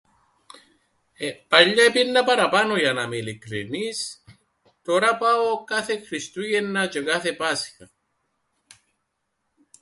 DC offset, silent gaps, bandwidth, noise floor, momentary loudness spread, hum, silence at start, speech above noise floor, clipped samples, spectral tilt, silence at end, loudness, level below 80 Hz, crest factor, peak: under 0.1%; none; 11.5 kHz; -76 dBFS; 16 LU; none; 1.2 s; 54 dB; under 0.1%; -3 dB/octave; 2 s; -21 LUFS; -68 dBFS; 24 dB; 0 dBFS